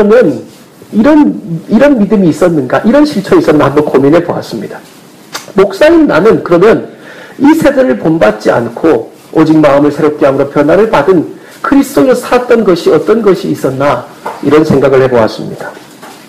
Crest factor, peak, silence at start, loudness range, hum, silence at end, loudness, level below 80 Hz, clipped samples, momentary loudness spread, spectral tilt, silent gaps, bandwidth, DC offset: 8 dB; 0 dBFS; 0 s; 2 LU; none; 0.1 s; -8 LUFS; -38 dBFS; 2%; 13 LU; -7 dB/octave; none; 15.5 kHz; under 0.1%